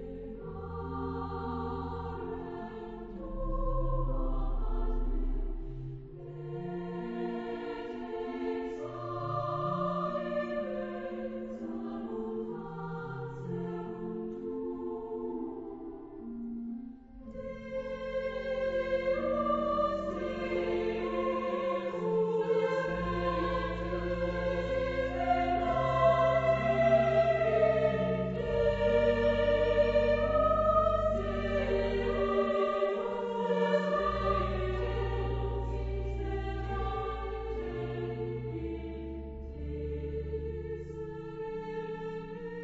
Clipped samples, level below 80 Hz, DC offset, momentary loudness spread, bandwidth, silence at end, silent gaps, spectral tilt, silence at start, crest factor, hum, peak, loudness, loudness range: under 0.1%; -40 dBFS; under 0.1%; 14 LU; 7.8 kHz; 0 s; none; -8 dB/octave; 0 s; 18 dB; none; -14 dBFS; -33 LUFS; 11 LU